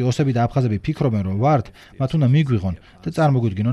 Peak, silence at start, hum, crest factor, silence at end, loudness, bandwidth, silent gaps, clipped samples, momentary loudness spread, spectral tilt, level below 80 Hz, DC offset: -6 dBFS; 0 s; none; 14 dB; 0 s; -20 LUFS; 11 kHz; none; under 0.1%; 10 LU; -8 dB/octave; -46 dBFS; under 0.1%